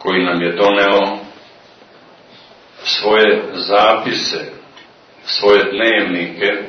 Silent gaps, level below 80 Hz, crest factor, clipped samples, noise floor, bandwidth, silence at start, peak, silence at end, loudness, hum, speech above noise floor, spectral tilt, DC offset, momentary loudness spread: none; -58 dBFS; 16 dB; under 0.1%; -44 dBFS; 6.6 kHz; 0 s; 0 dBFS; 0 s; -14 LUFS; none; 30 dB; -4 dB/octave; under 0.1%; 11 LU